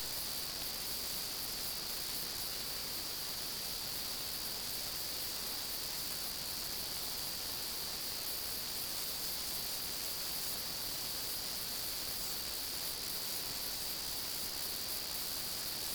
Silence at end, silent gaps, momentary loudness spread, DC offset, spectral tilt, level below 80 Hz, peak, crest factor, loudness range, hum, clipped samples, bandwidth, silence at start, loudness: 0 s; none; 1 LU; under 0.1%; -0.5 dB/octave; -60 dBFS; -24 dBFS; 16 dB; 1 LU; none; under 0.1%; over 20 kHz; 0 s; -37 LUFS